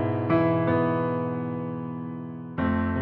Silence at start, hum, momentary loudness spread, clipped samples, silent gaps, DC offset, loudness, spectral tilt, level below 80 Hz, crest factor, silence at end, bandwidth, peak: 0 s; none; 12 LU; under 0.1%; none; under 0.1%; -27 LUFS; -11.5 dB/octave; -50 dBFS; 16 dB; 0 s; 4.7 kHz; -10 dBFS